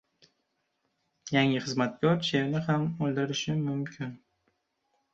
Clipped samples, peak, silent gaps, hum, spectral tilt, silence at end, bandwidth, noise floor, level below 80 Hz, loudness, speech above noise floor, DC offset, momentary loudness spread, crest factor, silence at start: under 0.1%; -12 dBFS; none; none; -5.5 dB/octave; 1 s; 8 kHz; -78 dBFS; -68 dBFS; -29 LUFS; 50 dB; under 0.1%; 11 LU; 20 dB; 1.25 s